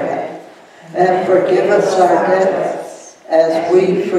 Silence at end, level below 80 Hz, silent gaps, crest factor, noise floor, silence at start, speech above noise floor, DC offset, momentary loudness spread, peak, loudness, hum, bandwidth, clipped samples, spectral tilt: 0 s; -66 dBFS; none; 14 dB; -38 dBFS; 0 s; 26 dB; under 0.1%; 14 LU; -2 dBFS; -14 LUFS; none; 11 kHz; under 0.1%; -6 dB/octave